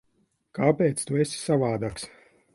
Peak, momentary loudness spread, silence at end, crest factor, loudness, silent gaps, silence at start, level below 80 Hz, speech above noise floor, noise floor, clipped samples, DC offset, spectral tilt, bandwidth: -6 dBFS; 17 LU; 0.45 s; 20 dB; -25 LUFS; none; 0.55 s; -58 dBFS; 45 dB; -70 dBFS; under 0.1%; under 0.1%; -5.5 dB/octave; 11.5 kHz